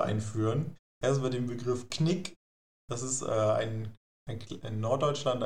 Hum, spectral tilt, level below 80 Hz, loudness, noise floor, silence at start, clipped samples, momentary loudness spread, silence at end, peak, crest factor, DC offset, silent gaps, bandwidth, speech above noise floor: none; -5.5 dB/octave; -62 dBFS; -32 LUFS; under -90 dBFS; 0 s; under 0.1%; 13 LU; 0 s; -14 dBFS; 18 dB; 0.5%; 0.79-1.01 s, 2.36-2.88 s, 3.97-4.26 s; 11.5 kHz; over 59 dB